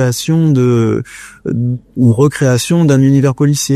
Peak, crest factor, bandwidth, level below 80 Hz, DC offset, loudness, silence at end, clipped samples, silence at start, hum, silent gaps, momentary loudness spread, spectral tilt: 0 dBFS; 12 dB; 14 kHz; -46 dBFS; under 0.1%; -12 LUFS; 0 s; under 0.1%; 0 s; none; none; 10 LU; -6.5 dB/octave